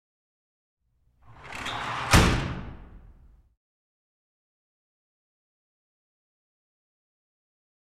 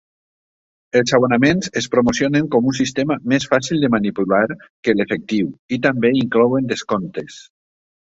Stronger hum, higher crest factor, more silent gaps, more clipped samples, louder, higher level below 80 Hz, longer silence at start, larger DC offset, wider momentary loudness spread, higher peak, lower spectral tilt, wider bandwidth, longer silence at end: neither; first, 28 dB vs 16 dB; second, none vs 4.70-4.83 s, 5.59-5.69 s; neither; second, -25 LUFS vs -18 LUFS; first, -40 dBFS vs -52 dBFS; first, 1.3 s vs 0.95 s; neither; first, 20 LU vs 7 LU; about the same, -4 dBFS vs -2 dBFS; second, -4 dB/octave vs -5.5 dB/octave; first, 15.5 kHz vs 8 kHz; first, 4.8 s vs 0.7 s